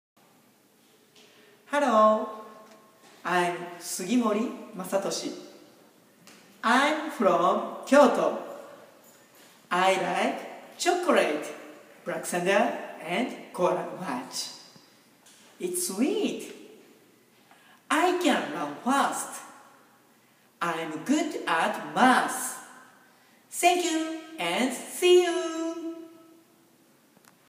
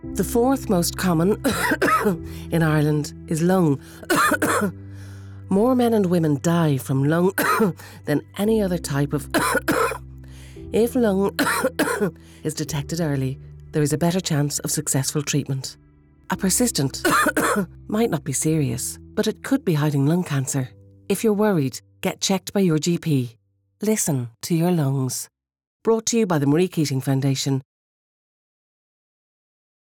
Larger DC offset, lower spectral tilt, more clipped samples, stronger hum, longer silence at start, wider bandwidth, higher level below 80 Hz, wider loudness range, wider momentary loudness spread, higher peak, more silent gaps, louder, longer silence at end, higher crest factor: neither; second, -3.5 dB/octave vs -5 dB/octave; neither; neither; first, 1.7 s vs 0.05 s; second, 15.5 kHz vs over 20 kHz; second, -88 dBFS vs -48 dBFS; first, 6 LU vs 3 LU; first, 17 LU vs 9 LU; first, -6 dBFS vs -10 dBFS; second, none vs 25.67-25.80 s; second, -26 LUFS vs -22 LUFS; second, 1.4 s vs 2.4 s; first, 22 dB vs 12 dB